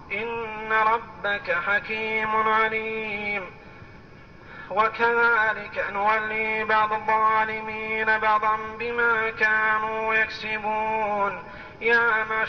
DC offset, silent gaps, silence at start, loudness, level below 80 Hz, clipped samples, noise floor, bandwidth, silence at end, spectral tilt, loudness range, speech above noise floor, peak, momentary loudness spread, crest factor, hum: 0.1%; none; 0 s; -23 LUFS; -54 dBFS; under 0.1%; -46 dBFS; 6.6 kHz; 0 s; -5 dB/octave; 3 LU; 23 dB; -10 dBFS; 8 LU; 14 dB; none